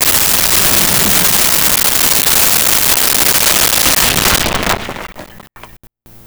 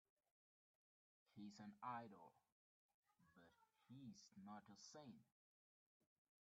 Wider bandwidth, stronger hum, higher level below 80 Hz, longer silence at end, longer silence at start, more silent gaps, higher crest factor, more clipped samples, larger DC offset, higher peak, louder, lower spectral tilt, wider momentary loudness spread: first, over 20 kHz vs 7.4 kHz; neither; first, -32 dBFS vs under -90 dBFS; second, 0.6 s vs 1.15 s; second, 0 s vs 1.3 s; second, none vs 2.52-3.03 s; second, 12 dB vs 24 dB; neither; neither; first, 0 dBFS vs -40 dBFS; first, -8 LUFS vs -60 LUFS; second, -1 dB/octave vs -4.5 dB/octave; second, 8 LU vs 11 LU